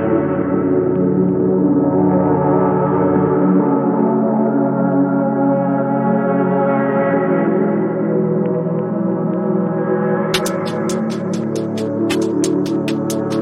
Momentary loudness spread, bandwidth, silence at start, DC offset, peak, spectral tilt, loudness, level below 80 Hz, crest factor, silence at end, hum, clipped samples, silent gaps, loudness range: 5 LU; 14.5 kHz; 0 s; under 0.1%; -2 dBFS; -7 dB/octave; -16 LUFS; -58 dBFS; 14 dB; 0 s; none; under 0.1%; none; 4 LU